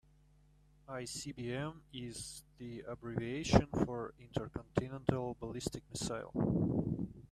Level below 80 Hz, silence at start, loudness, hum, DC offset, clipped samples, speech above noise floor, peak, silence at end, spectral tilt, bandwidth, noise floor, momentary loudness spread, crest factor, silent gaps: -54 dBFS; 0.9 s; -39 LUFS; 50 Hz at -60 dBFS; under 0.1%; under 0.1%; 29 dB; -12 dBFS; 0.05 s; -6 dB/octave; 14 kHz; -66 dBFS; 14 LU; 28 dB; none